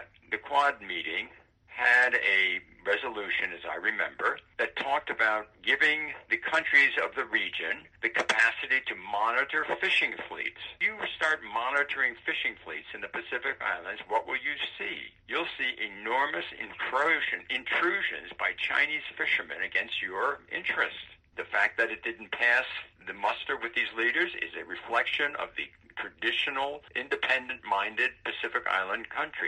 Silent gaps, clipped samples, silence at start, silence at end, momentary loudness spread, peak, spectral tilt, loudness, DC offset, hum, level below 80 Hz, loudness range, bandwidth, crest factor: none; under 0.1%; 0 s; 0 s; 11 LU; -10 dBFS; -2 dB/octave; -28 LUFS; under 0.1%; none; -68 dBFS; 5 LU; 11 kHz; 22 dB